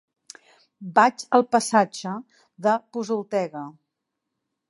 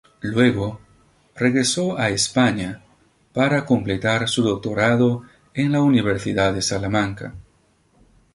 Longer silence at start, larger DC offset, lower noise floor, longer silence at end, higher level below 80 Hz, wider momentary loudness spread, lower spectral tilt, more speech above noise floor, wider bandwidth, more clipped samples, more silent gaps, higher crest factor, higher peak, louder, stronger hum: first, 0.8 s vs 0.25 s; neither; first, -82 dBFS vs -60 dBFS; about the same, 1 s vs 0.95 s; second, -80 dBFS vs -48 dBFS; first, 17 LU vs 12 LU; about the same, -4.5 dB/octave vs -5 dB/octave; first, 59 dB vs 40 dB; about the same, 11.5 kHz vs 11.5 kHz; neither; neither; about the same, 22 dB vs 20 dB; about the same, -2 dBFS vs -2 dBFS; second, -23 LUFS vs -20 LUFS; neither